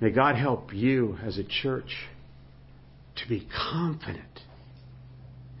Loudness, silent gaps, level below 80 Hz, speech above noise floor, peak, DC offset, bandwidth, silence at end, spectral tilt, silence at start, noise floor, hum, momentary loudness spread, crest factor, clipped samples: -29 LUFS; none; -52 dBFS; 23 dB; -8 dBFS; under 0.1%; 5.8 kHz; 0 s; -10.5 dB/octave; 0 s; -51 dBFS; none; 25 LU; 22 dB; under 0.1%